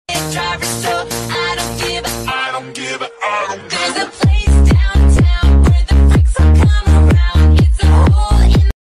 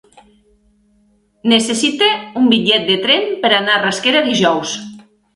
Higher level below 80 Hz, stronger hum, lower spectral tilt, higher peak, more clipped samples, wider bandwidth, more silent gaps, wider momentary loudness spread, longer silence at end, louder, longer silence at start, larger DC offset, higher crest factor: first, -12 dBFS vs -58 dBFS; neither; first, -5.5 dB/octave vs -3 dB/octave; second, -4 dBFS vs 0 dBFS; neither; first, 13.5 kHz vs 11.5 kHz; neither; about the same, 9 LU vs 8 LU; second, 0.2 s vs 0.35 s; about the same, -13 LUFS vs -14 LUFS; second, 0.1 s vs 1.45 s; neither; second, 8 dB vs 16 dB